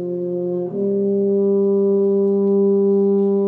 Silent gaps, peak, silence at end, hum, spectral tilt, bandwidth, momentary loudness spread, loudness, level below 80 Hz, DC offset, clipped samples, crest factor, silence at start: none; -8 dBFS; 0 s; none; -13.5 dB/octave; 1.5 kHz; 7 LU; -18 LUFS; -68 dBFS; under 0.1%; under 0.1%; 8 dB; 0 s